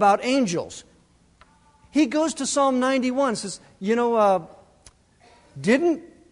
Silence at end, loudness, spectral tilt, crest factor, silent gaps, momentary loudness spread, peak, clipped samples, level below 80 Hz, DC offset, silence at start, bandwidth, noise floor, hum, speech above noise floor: 0.25 s; -22 LUFS; -4 dB/octave; 18 dB; none; 11 LU; -6 dBFS; under 0.1%; -62 dBFS; under 0.1%; 0 s; 11 kHz; -58 dBFS; none; 36 dB